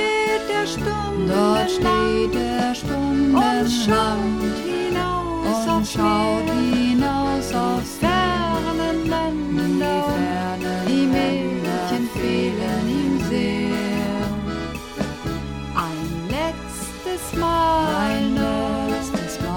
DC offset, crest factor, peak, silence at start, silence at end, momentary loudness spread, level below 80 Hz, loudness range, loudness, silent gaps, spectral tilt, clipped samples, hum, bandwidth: under 0.1%; 16 dB; -4 dBFS; 0 s; 0 s; 8 LU; -38 dBFS; 4 LU; -21 LUFS; none; -5.5 dB/octave; under 0.1%; none; 17.5 kHz